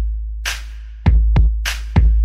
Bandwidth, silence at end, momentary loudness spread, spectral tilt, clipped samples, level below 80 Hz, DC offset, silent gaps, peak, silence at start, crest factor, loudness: 14 kHz; 0 s; 11 LU; -5 dB/octave; under 0.1%; -16 dBFS; under 0.1%; none; -2 dBFS; 0 s; 14 dB; -19 LUFS